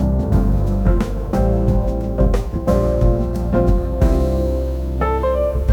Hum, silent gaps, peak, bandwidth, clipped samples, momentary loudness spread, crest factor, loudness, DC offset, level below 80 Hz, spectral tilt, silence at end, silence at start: none; none; -2 dBFS; 11.5 kHz; under 0.1%; 4 LU; 14 dB; -19 LUFS; under 0.1%; -20 dBFS; -9 dB/octave; 0 s; 0 s